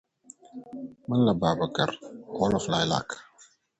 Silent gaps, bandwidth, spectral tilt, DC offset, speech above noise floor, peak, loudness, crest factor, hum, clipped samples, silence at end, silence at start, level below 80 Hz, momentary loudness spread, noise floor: none; 8.8 kHz; -5.5 dB/octave; under 0.1%; 32 dB; -10 dBFS; -26 LUFS; 20 dB; none; under 0.1%; 0.55 s; 0.55 s; -56 dBFS; 18 LU; -59 dBFS